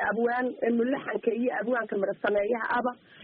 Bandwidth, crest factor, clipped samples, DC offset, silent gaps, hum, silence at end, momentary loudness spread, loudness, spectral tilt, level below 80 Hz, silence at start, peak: 4.7 kHz; 14 dB; under 0.1%; under 0.1%; none; none; 0 s; 3 LU; -28 LUFS; -4 dB/octave; -68 dBFS; 0 s; -14 dBFS